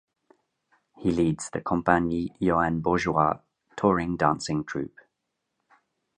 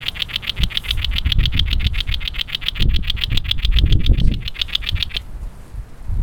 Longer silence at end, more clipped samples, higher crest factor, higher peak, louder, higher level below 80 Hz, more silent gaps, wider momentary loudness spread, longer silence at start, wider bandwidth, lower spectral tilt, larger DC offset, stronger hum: first, 1.3 s vs 0 s; neither; first, 24 dB vs 18 dB; second, -4 dBFS vs 0 dBFS; second, -26 LUFS vs -20 LUFS; second, -50 dBFS vs -20 dBFS; neither; second, 10 LU vs 13 LU; first, 1 s vs 0 s; second, 10.5 kHz vs 18.5 kHz; first, -6.5 dB/octave vs -4.5 dB/octave; neither; neither